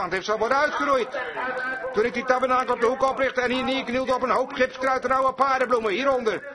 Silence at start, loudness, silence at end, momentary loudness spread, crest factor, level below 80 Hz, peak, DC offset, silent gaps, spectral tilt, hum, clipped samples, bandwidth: 0 s; -23 LUFS; 0 s; 5 LU; 18 dB; -56 dBFS; -6 dBFS; under 0.1%; none; -4 dB/octave; none; under 0.1%; 11 kHz